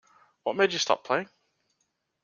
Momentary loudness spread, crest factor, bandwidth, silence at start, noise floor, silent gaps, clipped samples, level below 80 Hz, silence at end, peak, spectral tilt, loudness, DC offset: 11 LU; 22 dB; 7.4 kHz; 0.45 s; -77 dBFS; none; under 0.1%; -80 dBFS; 1 s; -8 dBFS; -2.5 dB/octave; -27 LUFS; under 0.1%